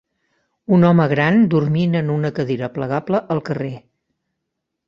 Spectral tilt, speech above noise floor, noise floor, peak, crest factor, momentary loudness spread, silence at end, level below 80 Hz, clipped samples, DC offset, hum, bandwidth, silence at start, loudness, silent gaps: -9 dB/octave; 61 dB; -78 dBFS; -2 dBFS; 16 dB; 12 LU; 1.1 s; -56 dBFS; under 0.1%; under 0.1%; none; 6.4 kHz; 0.7 s; -18 LUFS; none